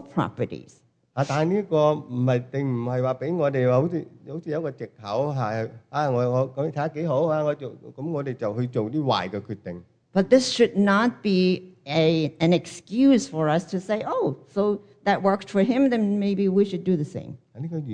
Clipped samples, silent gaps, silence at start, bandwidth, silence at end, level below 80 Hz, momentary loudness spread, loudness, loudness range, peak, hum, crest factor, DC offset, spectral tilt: under 0.1%; none; 0 s; 9.8 kHz; 0 s; -66 dBFS; 13 LU; -24 LUFS; 4 LU; -4 dBFS; none; 18 dB; under 0.1%; -6.5 dB/octave